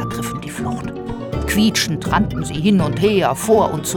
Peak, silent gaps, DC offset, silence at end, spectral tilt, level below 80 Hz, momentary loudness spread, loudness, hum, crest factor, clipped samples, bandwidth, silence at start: -2 dBFS; none; under 0.1%; 0 s; -5 dB/octave; -34 dBFS; 10 LU; -18 LUFS; none; 16 dB; under 0.1%; 18.5 kHz; 0 s